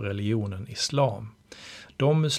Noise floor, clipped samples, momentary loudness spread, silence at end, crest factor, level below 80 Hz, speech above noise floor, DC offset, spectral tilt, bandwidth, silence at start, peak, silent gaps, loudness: -46 dBFS; under 0.1%; 19 LU; 0 s; 18 dB; -62 dBFS; 20 dB; under 0.1%; -5.5 dB/octave; 13.5 kHz; 0 s; -10 dBFS; none; -27 LUFS